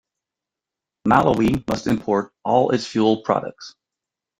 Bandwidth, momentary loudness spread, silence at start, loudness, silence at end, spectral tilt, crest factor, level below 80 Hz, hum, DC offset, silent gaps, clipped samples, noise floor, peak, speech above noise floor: 15.5 kHz; 11 LU; 1.05 s; -20 LUFS; 0.7 s; -6.5 dB/octave; 20 dB; -48 dBFS; none; under 0.1%; none; under 0.1%; -87 dBFS; -2 dBFS; 67 dB